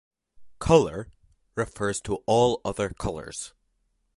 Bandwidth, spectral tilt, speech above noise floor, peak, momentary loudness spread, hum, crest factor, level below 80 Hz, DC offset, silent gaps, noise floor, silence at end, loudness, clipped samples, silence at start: 11.5 kHz; -5 dB/octave; 47 dB; -4 dBFS; 17 LU; none; 24 dB; -46 dBFS; under 0.1%; none; -72 dBFS; 0.7 s; -25 LUFS; under 0.1%; 0.4 s